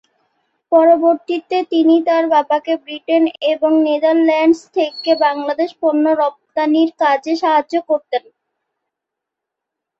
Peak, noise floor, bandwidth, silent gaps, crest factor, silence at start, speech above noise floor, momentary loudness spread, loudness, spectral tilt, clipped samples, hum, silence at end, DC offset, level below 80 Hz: -2 dBFS; -82 dBFS; 7.8 kHz; none; 14 dB; 0.7 s; 67 dB; 7 LU; -15 LUFS; -4 dB/octave; under 0.1%; none; 1.8 s; under 0.1%; -68 dBFS